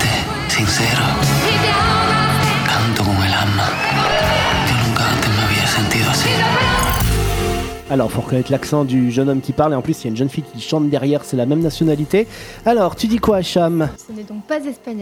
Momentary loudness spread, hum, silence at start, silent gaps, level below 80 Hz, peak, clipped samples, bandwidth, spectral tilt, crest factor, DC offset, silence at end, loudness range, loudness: 7 LU; none; 0 s; none; -32 dBFS; -2 dBFS; under 0.1%; over 20 kHz; -4.5 dB/octave; 16 dB; under 0.1%; 0 s; 3 LU; -16 LUFS